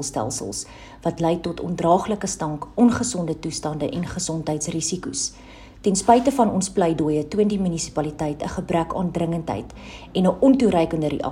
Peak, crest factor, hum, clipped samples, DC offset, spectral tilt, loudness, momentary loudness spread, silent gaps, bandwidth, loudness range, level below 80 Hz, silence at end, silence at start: -2 dBFS; 20 dB; none; under 0.1%; under 0.1%; -5.5 dB/octave; -22 LUFS; 11 LU; none; 15.5 kHz; 3 LU; -46 dBFS; 0 s; 0 s